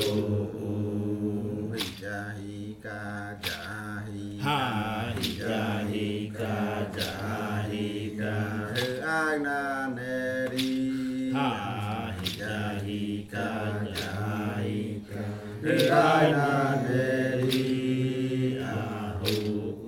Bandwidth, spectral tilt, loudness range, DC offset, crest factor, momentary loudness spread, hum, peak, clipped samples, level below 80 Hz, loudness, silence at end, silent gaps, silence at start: 18 kHz; -6 dB/octave; 8 LU; under 0.1%; 20 dB; 10 LU; none; -10 dBFS; under 0.1%; -58 dBFS; -29 LUFS; 0 s; none; 0 s